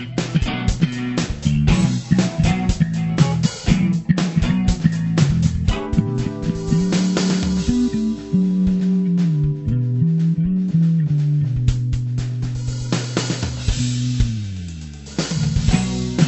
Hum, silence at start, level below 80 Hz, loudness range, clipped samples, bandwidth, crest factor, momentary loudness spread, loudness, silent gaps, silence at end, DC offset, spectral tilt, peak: none; 0 s; -30 dBFS; 3 LU; under 0.1%; 8.4 kHz; 18 dB; 6 LU; -19 LUFS; none; 0 s; under 0.1%; -6.5 dB/octave; -2 dBFS